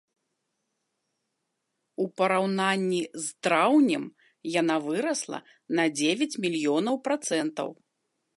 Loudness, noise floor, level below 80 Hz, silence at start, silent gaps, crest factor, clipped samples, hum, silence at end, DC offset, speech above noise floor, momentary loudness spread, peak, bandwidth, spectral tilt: -26 LUFS; -80 dBFS; -82 dBFS; 2 s; none; 20 dB; under 0.1%; none; 0.65 s; under 0.1%; 54 dB; 13 LU; -8 dBFS; 11.5 kHz; -4 dB/octave